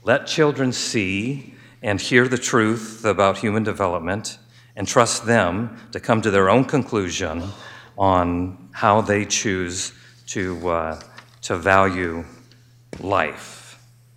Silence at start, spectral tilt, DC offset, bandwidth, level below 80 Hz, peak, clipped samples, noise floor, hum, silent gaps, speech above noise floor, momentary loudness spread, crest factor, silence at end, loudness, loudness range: 0.05 s; -4.5 dB/octave; under 0.1%; 16 kHz; -54 dBFS; 0 dBFS; under 0.1%; -51 dBFS; none; none; 30 dB; 16 LU; 20 dB; 0.4 s; -21 LUFS; 3 LU